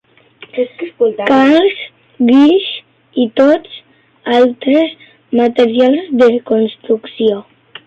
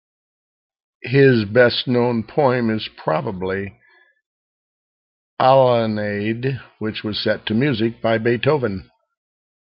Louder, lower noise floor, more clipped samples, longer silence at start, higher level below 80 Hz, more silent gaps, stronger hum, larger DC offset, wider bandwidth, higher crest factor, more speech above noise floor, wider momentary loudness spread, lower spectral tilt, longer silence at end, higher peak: first, -12 LUFS vs -19 LUFS; second, -41 dBFS vs under -90 dBFS; neither; second, 0.55 s vs 1.05 s; about the same, -58 dBFS vs -58 dBFS; second, none vs 4.26-5.37 s; neither; neither; first, 7.8 kHz vs 5.6 kHz; second, 12 dB vs 18 dB; second, 30 dB vs over 72 dB; first, 15 LU vs 12 LU; second, -6 dB/octave vs -10.5 dB/octave; second, 0.45 s vs 0.85 s; about the same, -2 dBFS vs -2 dBFS